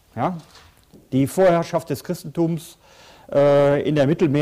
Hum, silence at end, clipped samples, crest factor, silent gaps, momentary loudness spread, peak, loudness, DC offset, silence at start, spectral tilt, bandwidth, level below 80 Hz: none; 0 s; under 0.1%; 12 dB; none; 12 LU; -8 dBFS; -20 LUFS; under 0.1%; 0.15 s; -7 dB/octave; 16 kHz; -54 dBFS